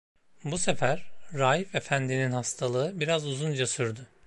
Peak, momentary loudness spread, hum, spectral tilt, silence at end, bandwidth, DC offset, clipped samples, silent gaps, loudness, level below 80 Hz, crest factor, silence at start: -10 dBFS; 8 LU; none; -4 dB/octave; 0 s; 11.5 kHz; under 0.1%; under 0.1%; none; -29 LUFS; -60 dBFS; 18 dB; 0.15 s